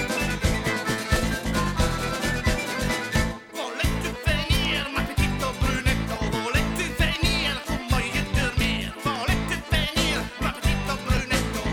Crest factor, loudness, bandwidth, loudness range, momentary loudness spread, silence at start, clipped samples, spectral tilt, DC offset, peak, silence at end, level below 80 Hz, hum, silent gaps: 16 dB; -25 LUFS; 17 kHz; 1 LU; 4 LU; 0 s; under 0.1%; -4.5 dB/octave; under 0.1%; -10 dBFS; 0 s; -30 dBFS; none; none